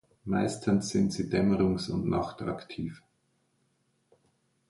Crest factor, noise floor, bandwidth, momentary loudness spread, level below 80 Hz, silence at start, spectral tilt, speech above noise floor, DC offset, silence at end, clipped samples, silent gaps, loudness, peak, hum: 18 dB; -73 dBFS; 11.5 kHz; 11 LU; -54 dBFS; 0.25 s; -6.5 dB/octave; 45 dB; under 0.1%; 1.7 s; under 0.1%; none; -30 LUFS; -14 dBFS; none